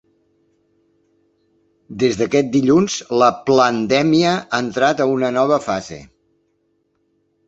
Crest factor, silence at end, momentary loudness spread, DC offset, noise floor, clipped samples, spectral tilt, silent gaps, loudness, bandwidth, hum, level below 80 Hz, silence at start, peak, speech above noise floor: 18 dB; 1.4 s; 9 LU; under 0.1%; -66 dBFS; under 0.1%; -5 dB/octave; none; -16 LUFS; 8 kHz; none; -56 dBFS; 1.9 s; 0 dBFS; 49 dB